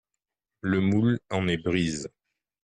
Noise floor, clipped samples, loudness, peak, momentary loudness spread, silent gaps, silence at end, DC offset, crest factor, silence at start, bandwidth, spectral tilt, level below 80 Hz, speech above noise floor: -87 dBFS; under 0.1%; -27 LUFS; -12 dBFS; 12 LU; none; 0.55 s; under 0.1%; 14 dB; 0.65 s; 10 kHz; -6 dB/octave; -56 dBFS; 62 dB